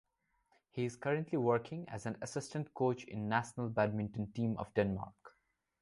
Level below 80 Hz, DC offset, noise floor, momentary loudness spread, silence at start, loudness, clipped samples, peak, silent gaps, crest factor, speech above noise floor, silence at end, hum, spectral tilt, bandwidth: -66 dBFS; under 0.1%; -79 dBFS; 9 LU; 0.75 s; -37 LUFS; under 0.1%; -18 dBFS; none; 20 dB; 42 dB; 0.55 s; none; -6.5 dB/octave; 11.5 kHz